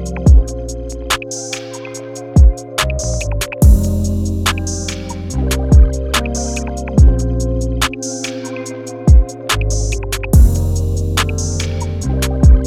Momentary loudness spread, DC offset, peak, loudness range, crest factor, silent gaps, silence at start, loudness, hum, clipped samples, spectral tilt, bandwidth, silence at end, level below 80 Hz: 13 LU; under 0.1%; 0 dBFS; 2 LU; 14 dB; none; 0 s; -16 LUFS; none; under 0.1%; -5 dB/octave; 15.5 kHz; 0 s; -16 dBFS